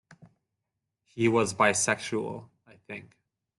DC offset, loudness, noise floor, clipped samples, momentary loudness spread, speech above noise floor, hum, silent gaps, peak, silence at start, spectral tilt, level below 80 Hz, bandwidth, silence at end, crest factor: under 0.1%; -26 LUFS; -85 dBFS; under 0.1%; 19 LU; 57 dB; none; none; -10 dBFS; 0.2 s; -3.5 dB/octave; -68 dBFS; 12 kHz; 0.55 s; 22 dB